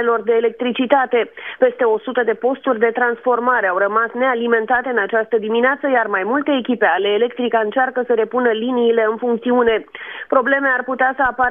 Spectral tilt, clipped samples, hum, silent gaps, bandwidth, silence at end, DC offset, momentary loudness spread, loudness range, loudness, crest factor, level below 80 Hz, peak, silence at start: -7.5 dB/octave; under 0.1%; none; none; 3.8 kHz; 0 s; under 0.1%; 3 LU; 1 LU; -17 LUFS; 16 dB; -56 dBFS; 0 dBFS; 0 s